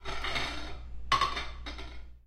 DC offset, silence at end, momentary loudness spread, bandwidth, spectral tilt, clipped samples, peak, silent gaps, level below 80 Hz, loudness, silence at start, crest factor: under 0.1%; 0 s; 17 LU; 14 kHz; -3 dB/octave; under 0.1%; -12 dBFS; none; -42 dBFS; -33 LUFS; 0 s; 22 dB